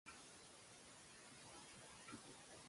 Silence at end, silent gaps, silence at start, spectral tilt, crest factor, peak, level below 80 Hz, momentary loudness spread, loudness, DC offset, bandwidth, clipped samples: 0 s; none; 0.05 s; -2 dB/octave; 20 dB; -42 dBFS; -82 dBFS; 4 LU; -59 LUFS; under 0.1%; 11.5 kHz; under 0.1%